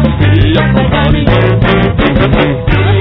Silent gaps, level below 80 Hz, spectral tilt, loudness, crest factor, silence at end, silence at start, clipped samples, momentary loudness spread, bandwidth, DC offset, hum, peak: none; -18 dBFS; -9.5 dB/octave; -9 LUFS; 8 dB; 0 s; 0 s; 1%; 2 LU; 5.4 kHz; under 0.1%; none; 0 dBFS